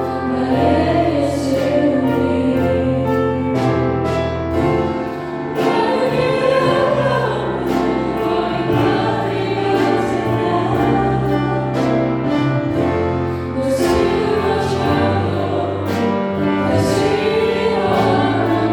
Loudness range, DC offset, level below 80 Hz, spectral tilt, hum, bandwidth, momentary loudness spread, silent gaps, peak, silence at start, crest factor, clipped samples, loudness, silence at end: 1 LU; under 0.1%; -40 dBFS; -7 dB/octave; none; 18 kHz; 4 LU; none; -4 dBFS; 0 s; 14 dB; under 0.1%; -17 LUFS; 0 s